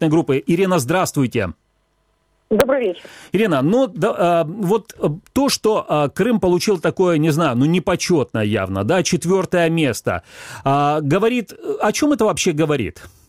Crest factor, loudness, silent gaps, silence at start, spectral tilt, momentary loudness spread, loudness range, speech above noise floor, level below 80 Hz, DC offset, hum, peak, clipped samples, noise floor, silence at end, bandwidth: 18 dB; -18 LUFS; none; 0 s; -5.5 dB/octave; 7 LU; 2 LU; 46 dB; -48 dBFS; under 0.1%; none; 0 dBFS; under 0.1%; -64 dBFS; 0.2 s; 16 kHz